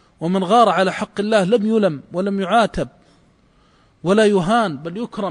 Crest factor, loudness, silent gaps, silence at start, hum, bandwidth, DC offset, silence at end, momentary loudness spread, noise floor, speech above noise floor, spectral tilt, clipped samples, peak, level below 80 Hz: 16 dB; -18 LUFS; none; 0.2 s; none; 10.5 kHz; under 0.1%; 0 s; 13 LU; -55 dBFS; 38 dB; -6 dB/octave; under 0.1%; -2 dBFS; -48 dBFS